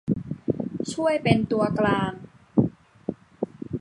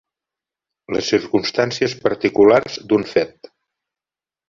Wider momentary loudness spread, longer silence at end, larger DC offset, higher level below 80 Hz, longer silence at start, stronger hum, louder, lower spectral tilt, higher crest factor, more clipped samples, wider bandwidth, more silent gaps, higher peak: first, 14 LU vs 9 LU; second, 0 s vs 1.2 s; neither; about the same, -52 dBFS vs -56 dBFS; second, 0.05 s vs 0.9 s; neither; second, -25 LUFS vs -18 LUFS; first, -7 dB/octave vs -5 dB/octave; about the same, 22 dB vs 18 dB; neither; first, 11 kHz vs 7.4 kHz; neither; about the same, -2 dBFS vs -2 dBFS